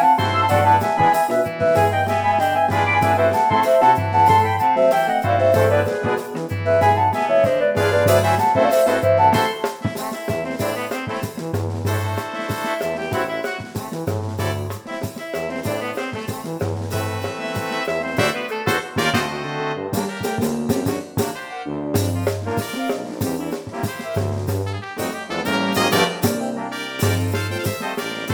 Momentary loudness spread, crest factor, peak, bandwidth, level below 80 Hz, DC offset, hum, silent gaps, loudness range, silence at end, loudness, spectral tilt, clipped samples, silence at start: 11 LU; 18 dB; -2 dBFS; over 20 kHz; -52 dBFS; under 0.1%; none; none; 9 LU; 0 s; -20 LUFS; -5.5 dB/octave; under 0.1%; 0 s